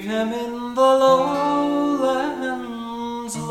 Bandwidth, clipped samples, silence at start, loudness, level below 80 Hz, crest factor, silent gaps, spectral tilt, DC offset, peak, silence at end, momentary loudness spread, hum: 14 kHz; under 0.1%; 0 s; -21 LUFS; -56 dBFS; 16 dB; none; -4.5 dB/octave; under 0.1%; -4 dBFS; 0 s; 13 LU; none